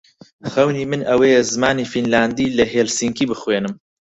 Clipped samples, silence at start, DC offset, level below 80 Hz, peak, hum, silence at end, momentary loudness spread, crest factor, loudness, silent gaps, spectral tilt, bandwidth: under 0.1%; 0.45 s; under 0.1%; -50 dBFS; -2 dBFS; none; 0.4 s; 8 LU; 16 dB; -18 LUFS; none; -4 dB/octave; 8.4 kHz